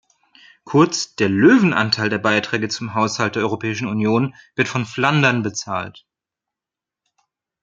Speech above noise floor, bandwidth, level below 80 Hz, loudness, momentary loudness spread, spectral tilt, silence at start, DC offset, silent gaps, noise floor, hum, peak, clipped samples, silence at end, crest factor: 69 dB; 9.2 kHz; -62 dBFS; -18 LUFS; 9 LU; -5 dB/octave; 0.65 s; under 0.1%; none; -87 dBFS; none; -2 dBFS; under 0.1%; 1.7 s; 18 dB